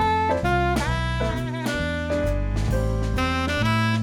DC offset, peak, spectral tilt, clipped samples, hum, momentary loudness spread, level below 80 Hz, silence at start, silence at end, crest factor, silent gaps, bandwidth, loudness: under 0.1%; -10 dBFS; -6 dB/octave; under 0.1%; none; 4 LU; -30 dBFS; 0 s; 0 s; 14 dB; none; 16.5 kHz; -24 LUFS